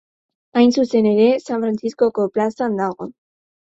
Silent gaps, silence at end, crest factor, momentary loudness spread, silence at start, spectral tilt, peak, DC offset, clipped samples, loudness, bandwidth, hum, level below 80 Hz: none; 0.65 s; 16 dB; 9 LU; 0.55 s; -6.5 dB/octave; -2 dBFS; under 0.1%; under 0.1%; -18 LUFS; 8 kHz; none; -62 dBFS